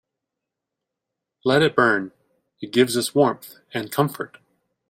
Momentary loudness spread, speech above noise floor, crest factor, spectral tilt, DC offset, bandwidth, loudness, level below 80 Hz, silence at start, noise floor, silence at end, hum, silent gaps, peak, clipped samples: 17 LU; 63 dB; 22 dB; -4.5 dB/octave; under 0.1%; 16.5 kHz; -21 LUFS; -64 dBFS; 1.45 s; -84 dBFS; 0.65 s; none; none; -2 dBFS; under 0.1%